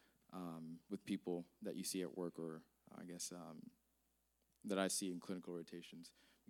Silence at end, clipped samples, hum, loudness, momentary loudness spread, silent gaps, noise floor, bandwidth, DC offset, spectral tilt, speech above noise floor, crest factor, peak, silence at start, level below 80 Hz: 0.4 s; under 0.1%; none; -47 LUFS; 17 LU; none; -83 dBFS; 18.5 kHz; under 0.1%; -4 dB/octave; 36 dB; 22 dB; -26 dBFS; 0.3 s; -88 dBFS